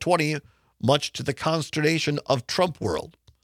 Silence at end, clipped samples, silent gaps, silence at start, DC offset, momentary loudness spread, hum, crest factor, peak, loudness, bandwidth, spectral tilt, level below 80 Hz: 0.35 s; under 0.1%; none; 0 s; under 0.1%; 7 LU; none; 20 dB; -6 dBFS; -25 LUFS; 15.5 kHz; -5 dB/octave; -58 dBFS